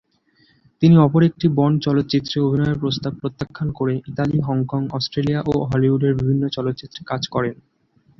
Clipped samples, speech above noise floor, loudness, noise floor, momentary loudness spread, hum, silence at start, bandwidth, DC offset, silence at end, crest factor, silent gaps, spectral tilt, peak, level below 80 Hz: under 0.1%; 40 dB; -20 LUFS; -59 dBFS; 11 LU; none; 0.8 s; 6.2 kHz; under 0.1%; 0.65 s; 16 dB; none; -8 dB/octave; -2 dBFS; -48 dBFS